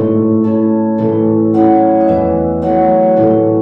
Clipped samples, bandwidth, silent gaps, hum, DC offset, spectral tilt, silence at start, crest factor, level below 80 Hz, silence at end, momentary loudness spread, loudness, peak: under 0.1%; 3.8 kHz; none; none; 0.2%; -11.5 dB/octave; 0 s; 10 dB; -40 dBFS; 0 s; 4 LU; -11 LUFS; 0 dBFS